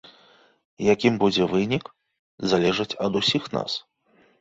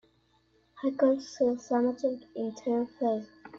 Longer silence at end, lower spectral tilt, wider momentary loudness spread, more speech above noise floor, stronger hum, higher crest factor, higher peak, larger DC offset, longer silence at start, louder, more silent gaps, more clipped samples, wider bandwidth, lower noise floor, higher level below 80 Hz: first, 0.6 s vs 0 s; about the same, -5 dB/octave vs -6 dB/octave; about the same, 9 LU vs 8 LU; about the same, 38 dB vs 39 dB; neither; about the same, 20 dB vs 18 dB; first, -6 dBFS vs -12 dBFS; neither; about the same, 0.8 s vs 0.75 s; first, -23 LUFS vs -30 LUFS; first, 2.19-2.38 s vs none; neither; about the same, 8 kHz vs 7.6 kHz; second, -61 dBFS vs -68 dBFS; first, -58 dBFS vs -72 dBFS